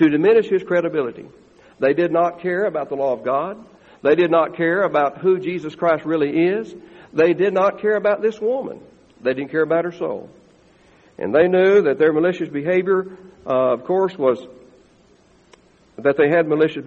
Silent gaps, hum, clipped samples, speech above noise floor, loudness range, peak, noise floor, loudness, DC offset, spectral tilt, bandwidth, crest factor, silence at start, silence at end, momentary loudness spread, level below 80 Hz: none; none; under 0.1%; 35 dB; 4 LU; -2 dBFS; -54 dBFS; -19 LUFS; under 0.1%; -7.5 dB/octave; 7.2 kHz; 16 dB; 0 s; 0 s; 11 LU; -62 dBFS